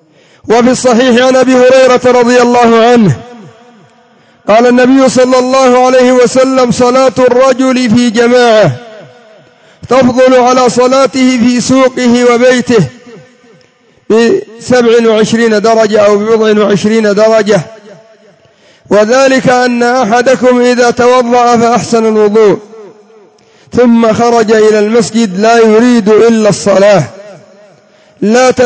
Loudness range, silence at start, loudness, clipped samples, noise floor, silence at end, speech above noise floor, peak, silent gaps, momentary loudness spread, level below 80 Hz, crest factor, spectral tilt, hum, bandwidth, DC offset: 3 LU; 0.45 s; -6 LUFS; 3%; -45 dBFS; 0 s; 40 dB; 0 dBFS; none; 5 LU; -46 dBFS; 6 dB; -5 dB/octave; none; 8 kHz; under 0.1%